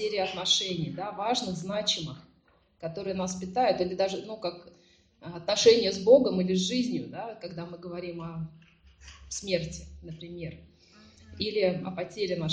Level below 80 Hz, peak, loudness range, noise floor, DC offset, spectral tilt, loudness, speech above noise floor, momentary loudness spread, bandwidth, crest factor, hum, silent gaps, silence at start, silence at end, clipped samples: -58 dBFS; -6 dBFS; 12 LU; -65 dBFS; under 0.1%; -4 dB/octave; -28 LUFS; 36 dB; 20 LU; 10 kHz; 24 dB; none; none; 0 s; 0 s; under 0.1%